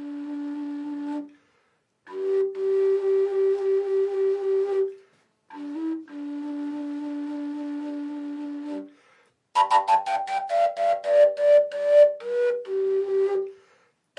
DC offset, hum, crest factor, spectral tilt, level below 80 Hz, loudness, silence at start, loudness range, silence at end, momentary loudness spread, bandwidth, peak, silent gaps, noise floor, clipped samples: under 0.1%; none; 18 dB; -4 dB/octave; under -90 dBFS; -24 LUFS; 0 s; 12 LU; 0.65 s; 14 LU; 11 kHz; -8 dBFS; none; -69 dBFS; under 0.1%